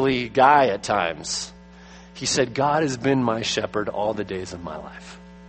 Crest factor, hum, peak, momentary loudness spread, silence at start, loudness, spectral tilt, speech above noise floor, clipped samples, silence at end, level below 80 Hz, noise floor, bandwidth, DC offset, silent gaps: 20 dB; none; -2 dBFS; 19 LU; 0 s; -22 LUFS; -4 dB/octave; 23 dB; under 0.1%; 0 s; -52 dBFS; -45 dBFS; 8.8 kHz; under 0.1%; none